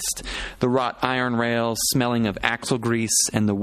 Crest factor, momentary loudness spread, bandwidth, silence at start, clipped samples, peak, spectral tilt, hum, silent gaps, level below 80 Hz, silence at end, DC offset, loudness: 22 dB; 6 LU; 14.5 kHz; 0 s; under 0.1%; 0 dBFS; -3.5 dB/octave; none; none; -46 dBFS; 0 s; under 0.1%; -22 LUFS